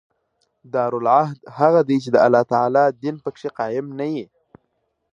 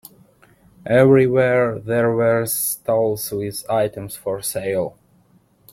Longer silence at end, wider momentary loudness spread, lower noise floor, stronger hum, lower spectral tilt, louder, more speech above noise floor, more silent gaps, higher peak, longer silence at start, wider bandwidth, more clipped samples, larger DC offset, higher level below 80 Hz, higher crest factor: about the same, 0.9 s vs 0.85 s; about the same, 12 LU vs 12 LU; first, -71 dBFS vs -56 dBFS; neither; first, -7.5 dB/octave vs -5.5 dB/octave; about the same, -19 LUFS vs -19 LUFS; first, 53 dB vs 38 dB; neither; about the same, -2 dBFS vs -2 dBFS; about the same, 0.75 s vs 0.85 s; second, 9.4 kHz vs 16.5 kHz; neither; neither; second, -68 dBFS vs -56 dBFS; about the same, 18 dB vs 18 dB